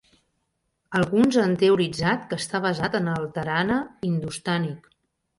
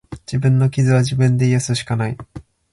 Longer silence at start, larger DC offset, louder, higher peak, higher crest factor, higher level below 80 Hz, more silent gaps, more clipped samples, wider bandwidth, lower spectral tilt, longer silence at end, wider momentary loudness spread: first, 0.9 s vs 0.1 s; neither; second, -24 LUFS vs -17 LUFS; second, -8 dBFS vs -4 dBFS; about the same, 16 dB vs 12 dB; second, -56 dBFS vs -46 dBFS; neither; neither; about the same, 11.5 kHz vs 11.5 kHz; about the same, -6 dB/octave vs -6.5 dB/octave; first, 0.6 s vs 0.3 s; about the same, 8 LU vs 10 LU